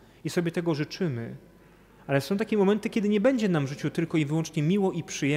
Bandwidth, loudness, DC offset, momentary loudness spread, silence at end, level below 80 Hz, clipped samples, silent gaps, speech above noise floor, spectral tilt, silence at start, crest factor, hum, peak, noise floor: 15.5 kHz; -27 LUFS; under 0.1%; 8 LU; 0 s; -62 dBFS; under 0.1%; none; 29 dB; -6.5 dB/octave; 0.25 s; 14 dB; none; -12 dBFS; -55 dBFS